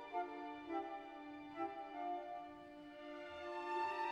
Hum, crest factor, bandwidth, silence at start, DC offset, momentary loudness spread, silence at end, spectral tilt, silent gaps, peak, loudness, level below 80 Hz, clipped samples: none; 16 dB; 11 kHz; 0 s; under 0.1%; 11 LU; 0 s; -4.5 dB/octave; none; -30 dBFS; -47 LUFS; -78 dBFS; under 0.1%